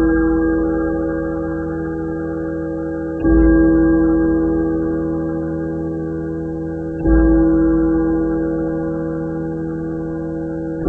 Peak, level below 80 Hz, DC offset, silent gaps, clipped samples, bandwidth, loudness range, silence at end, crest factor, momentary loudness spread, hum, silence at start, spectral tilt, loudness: -2 dBFS; -26 dBFS; 0.2%; none; under 0.1%; 1.8 kHz; 3 LU; 0 s; 14 dB; 11 LU; none; 0 s; -11.5 dB/octave; -18 LUFS